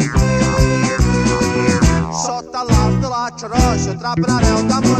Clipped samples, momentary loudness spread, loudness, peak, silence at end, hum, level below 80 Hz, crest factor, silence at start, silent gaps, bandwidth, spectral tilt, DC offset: under 0.1%; 6 LU; -16 LUFS; 0 dBFS; 0 s; none; -22 dBFS; 14 dB; 0 s; none; 13.5 kHz; -5.5 dB/octave; under 0.1%